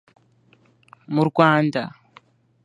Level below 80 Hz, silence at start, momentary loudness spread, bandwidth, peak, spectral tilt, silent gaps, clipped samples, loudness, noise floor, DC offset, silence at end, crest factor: -66 dBFS; 1.1 s; 12 LU; 10.5 kHz; 0 dBFS; -7.5 dB/octave; none; under 0.1%; -19 LUFS; -58 dBFS; under 0.1%; 0.75 s; 22 dB